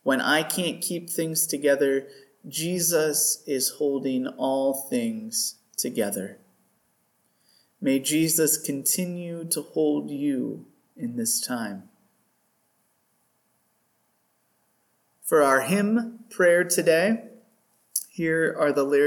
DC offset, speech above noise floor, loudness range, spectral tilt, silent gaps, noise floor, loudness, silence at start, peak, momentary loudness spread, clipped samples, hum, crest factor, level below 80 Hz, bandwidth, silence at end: under 0.1%; 46 dB; 8 LU; -3 dB/octave; none; -70 dBFS; -24 LUFS; 0.05 s; -6 dBFS; 11 LU; under 0.1%; none; 20 dB; -78 dBFS; 19 kHz; 0 s